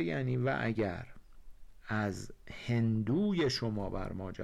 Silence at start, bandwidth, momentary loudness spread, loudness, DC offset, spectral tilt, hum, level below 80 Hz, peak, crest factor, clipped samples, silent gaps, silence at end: 0 s; 12 kHz; 14 LU; -34 LUFS; under 0.1%; -6.5 dB/octave; none; -52 dBFS; -24 dBFS; 10 dB; under 0.1%; none; 0 s